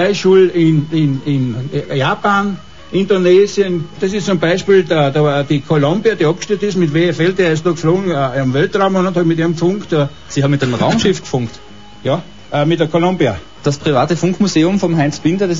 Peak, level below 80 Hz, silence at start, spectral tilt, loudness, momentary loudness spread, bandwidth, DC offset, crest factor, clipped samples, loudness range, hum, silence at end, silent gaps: -2 dBFS; -46 dBFS; 0 s; -6.5 dB/octave; -14 LUFS; 8 LU; 7.6 kHz; 1%; 12 dB; under 0.1%; 3 LU; none; 0 s; none